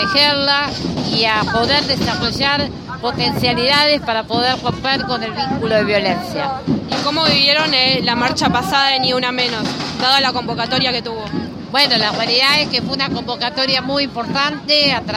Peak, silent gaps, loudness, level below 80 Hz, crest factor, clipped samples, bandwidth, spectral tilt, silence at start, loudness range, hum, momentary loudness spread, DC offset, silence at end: 0 dBFS; none; -15 LUFS; -44 dBFS; 16 dB; under 0.1%; 16 kHz; -4 dB/octave; 0 s; 2 LU; none; 9 LU; under 0.1%; 0 s